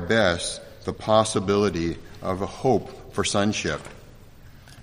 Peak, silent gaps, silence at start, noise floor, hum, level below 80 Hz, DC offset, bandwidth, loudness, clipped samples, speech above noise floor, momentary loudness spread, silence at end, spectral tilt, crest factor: -4 dBFS; none; 0 s; -46 dBFS; none; -48 dBFS; under 0.1%; 15.5 kHz; -24 LUFS; under 0.1%; 22 dB; 13 LU; 0 s; -4.5 dB/octave; 22 dB